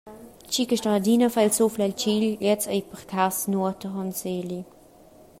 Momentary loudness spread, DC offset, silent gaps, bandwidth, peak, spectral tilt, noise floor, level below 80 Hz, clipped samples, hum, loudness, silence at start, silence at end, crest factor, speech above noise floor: 10 LU; under 0.1%; none; 16 kHz; -8 dBFS; -4.5 dB/octave; -51 dBFS; -62 dBFS; under 0.1%; none; -24 LUFS; 0.05 s; 0.75 s; 16 dB; 27 dB